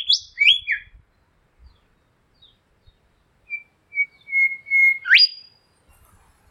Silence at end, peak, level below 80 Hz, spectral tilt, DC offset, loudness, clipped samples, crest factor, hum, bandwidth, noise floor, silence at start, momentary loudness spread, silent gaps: 1.15 s; 0 dBFS; -60 dBFS; 3 dB/octave; under 0.1%; -16 LUFS; under 0.1%; 22 dB; none; 15.5 kHz; -63 dBFS; 0 s; 20 LU; none